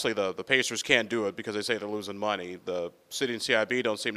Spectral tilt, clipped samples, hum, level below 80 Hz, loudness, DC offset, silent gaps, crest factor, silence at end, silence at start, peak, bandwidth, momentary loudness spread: -2.5 dB/octave; under 0.1%; none; -70 dBFS; -28 LUFS; under 0.1%; none; 26 dB; 0 s; 0 s; -4 dBFS; 15.5 kHz; 10 LU